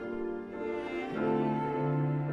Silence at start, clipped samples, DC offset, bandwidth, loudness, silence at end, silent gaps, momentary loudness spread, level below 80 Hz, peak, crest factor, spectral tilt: 0 s; under 0.1%; under 0.1%; 6 kHz; -33 LUFS; 0 s; none; 7 LU; -62 dBFS; -18 dBFS; 14 dB; -9.5 dB/octave